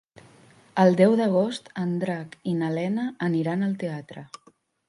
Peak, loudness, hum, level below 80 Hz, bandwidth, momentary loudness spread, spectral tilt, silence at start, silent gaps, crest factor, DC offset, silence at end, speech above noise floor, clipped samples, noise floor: -6 dBFS; -24 LUFS; none; -72 dBFS; 11.5 kHz; 15 LU; -7.5 dB/octave; 0.75 s; none; 20 dB; under 0.1%; 0.65 s; 30 dB; under 0.1%; -54 dBFS